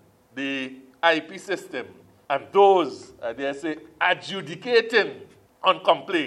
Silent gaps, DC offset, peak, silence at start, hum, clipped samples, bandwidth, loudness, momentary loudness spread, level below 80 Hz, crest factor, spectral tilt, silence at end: none; under 0.1%; -2 dBFS; 0.35 s; none; under 0.1%; 12 kHz; -23 LUFS; 16 LU; -72 dBFS; 22 dB; -4 dB/octave; 0 s